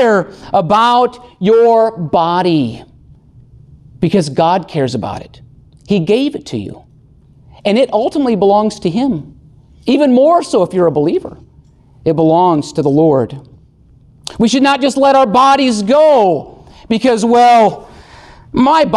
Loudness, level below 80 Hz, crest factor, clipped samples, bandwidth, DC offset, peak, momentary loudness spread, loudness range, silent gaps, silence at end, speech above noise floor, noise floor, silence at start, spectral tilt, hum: -12 LUFS; -46 dBFS; 12 dB; under 0.1%; 12 kHz; under 0.1%; -2 dBFS; 13 LU; 6 LU; none; 0 s; 34 dB; -45 dBFS; 0 s; -6 dB/octave; none